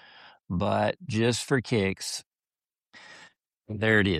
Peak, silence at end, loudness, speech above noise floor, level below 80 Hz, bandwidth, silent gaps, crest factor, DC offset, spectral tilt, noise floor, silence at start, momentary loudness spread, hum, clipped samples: -10 dBFS; 0 s; -27 LUFS; over 64 dB; -58 dBFS; 13.5 kHz; 2.26-2.31 s; 20 dB; under 0.1%; -5 dB/octave; under -90 dBFS; 0.25 s; 19 LU; none; under 0.1%